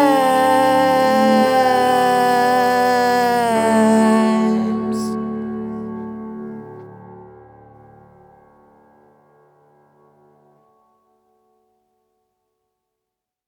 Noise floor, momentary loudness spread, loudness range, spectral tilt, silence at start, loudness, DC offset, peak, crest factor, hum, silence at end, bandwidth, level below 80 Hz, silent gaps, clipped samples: -82 dBFS; 17 LU; 19 LU; -5 dB/octave; 0 s; -16 LUFS; under 0.1%; -4 dBFS; 16 dB; none; 6.2 s; 18.5 kHz; -60 dBFS; none; under 0.1%